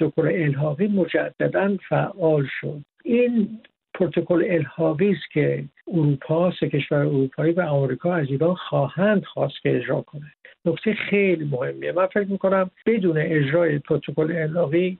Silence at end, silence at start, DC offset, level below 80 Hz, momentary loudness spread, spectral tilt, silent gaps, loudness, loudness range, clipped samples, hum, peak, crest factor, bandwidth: 0.05 s; 0 s; under 0.1%; -62 dBFS; 7 LU; -6.5 dB/octave; none; -22 LUFS; 2 LU; under 0.1%; none; -6 dBFS; 16 dB; 4.2 kHz